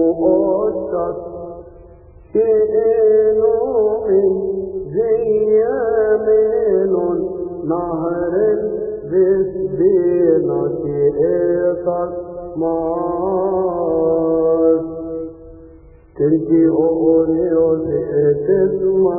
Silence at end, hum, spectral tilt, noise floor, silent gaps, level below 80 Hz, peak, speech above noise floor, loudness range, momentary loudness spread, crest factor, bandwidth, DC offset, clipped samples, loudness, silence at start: 0 s; none; -16 dB/octave; -42 dBFS; none; -46 dBFS; -2 dBFS; 27 dB; 3 LU; 9 LU; 14 dB; 2.6 kHz; under 0.1%; under 0.1%; -16 LUFS; 0 s